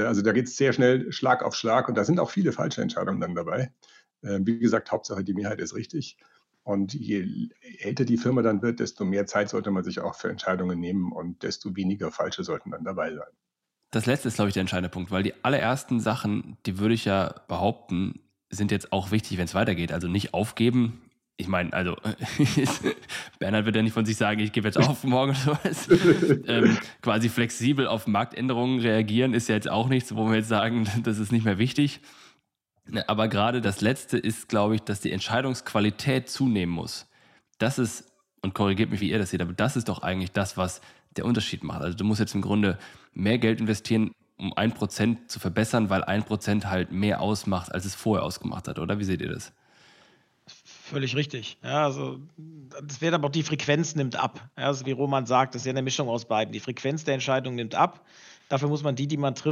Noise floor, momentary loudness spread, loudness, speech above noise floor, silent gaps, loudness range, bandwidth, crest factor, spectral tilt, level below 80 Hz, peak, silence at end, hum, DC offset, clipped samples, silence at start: -80 dBFS; 9 LU; -26 LUFS; 55 dB; none; 6 LU; 15.5 kHz; 20 dB; -5.5 dB/octave; -58 dBFS; -6 dBFS; 0 s; none; under 0.1%; under 0.1%; 0 s